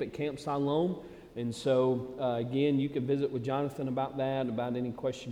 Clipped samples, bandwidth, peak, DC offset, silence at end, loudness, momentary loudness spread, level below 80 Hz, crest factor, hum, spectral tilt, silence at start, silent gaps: under 0.1%; 13 kHz; -16 dBFS; under 0.1%; 0 s; -32 LUFS; 7 LU; -64 dBFS; 14 dB; none; -7.5 dB/octave; 0 s; none